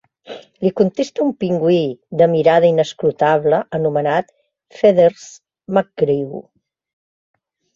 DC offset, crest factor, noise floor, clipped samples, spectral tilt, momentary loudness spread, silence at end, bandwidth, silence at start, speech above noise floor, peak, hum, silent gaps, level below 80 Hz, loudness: under 0.1%; 16 dB; -37 dBFS; under 0.1%; -7 dB/octave; 9 LU; 1.35 s; 7.6 kHz; 0.3 s; 21 dB; -2 dBFS; none; none; -60 dBFS; -16 LUFS